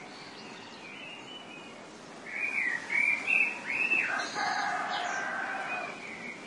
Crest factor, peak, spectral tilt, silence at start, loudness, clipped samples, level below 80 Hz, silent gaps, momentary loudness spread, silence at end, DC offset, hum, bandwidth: 18 dB; -14 dBFS; -2 dB/octave; 0 s; -29 LUFS; under 0.1%; -78 dBFS; none; 19 LU; 0 s; under 0.1%; none; 11.5 kHz